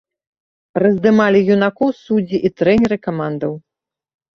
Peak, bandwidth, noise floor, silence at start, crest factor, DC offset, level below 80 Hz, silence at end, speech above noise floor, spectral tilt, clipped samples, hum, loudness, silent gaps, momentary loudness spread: -2 dBFS; 7.2 kHz; -85 dBFS; 0.75 s; 16 dB; under 0.1%; -50 dBFS; 0.75 s; 70 dB; -8 dB/octave; under 0.1%; none; -16 LUFS; none; 11 LU